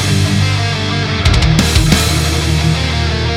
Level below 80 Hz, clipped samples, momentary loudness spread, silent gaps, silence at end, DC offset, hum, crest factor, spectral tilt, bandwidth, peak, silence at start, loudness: -20 dBFS; under 0.1%; 4 LU; none; 0 s; under 0.1%; none; 12 dB; -4.5 dB/octave; 16.5 kHz; 0 dBFS; 0 s; -13 LUFS